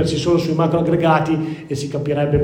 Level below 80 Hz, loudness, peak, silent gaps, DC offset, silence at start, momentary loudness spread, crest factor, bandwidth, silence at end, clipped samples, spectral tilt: -40 dBFS; -18 LUFS; -2 dBFS; none; under 0.1%; 0 s; 9 LU; 16 dB; 15.5 kHz; 0 s; under 0.1%; -7 dB/octave